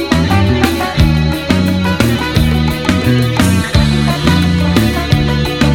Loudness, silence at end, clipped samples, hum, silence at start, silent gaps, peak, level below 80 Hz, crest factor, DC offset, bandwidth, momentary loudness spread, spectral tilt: -12 LUFS; 0 s; 0.3%; none; 0 s; none; 0 dBFS; -22 dBFS; 12 dB; 0.7%; 18 kHz; 2 LU; -6 dB/octave